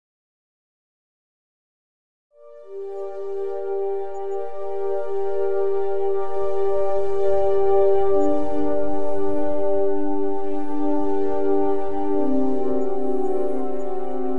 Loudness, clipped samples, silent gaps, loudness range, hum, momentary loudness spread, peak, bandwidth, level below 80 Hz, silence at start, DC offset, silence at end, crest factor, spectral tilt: -24 LUFS; under 0.1%; none; 10 LU; none; 9 LU; -8 dBFS; 7.2 kHz; -50 dBFS; 2.3 s; 10%; 0 s; 12 dB; -8.5 dB/octave